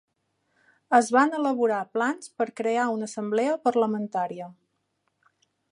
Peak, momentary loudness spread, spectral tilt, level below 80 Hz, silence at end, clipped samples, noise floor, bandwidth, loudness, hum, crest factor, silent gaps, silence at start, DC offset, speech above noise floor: -4 dBFS; 9 LU; -5 dB/octave; -82 dBFS; 1.2 s; under 0.1%; -75 dBFS; 11.5 kHz; -25 LUFS; none; 22 dB; none; 0.9 s; under 0.1%; 51 dB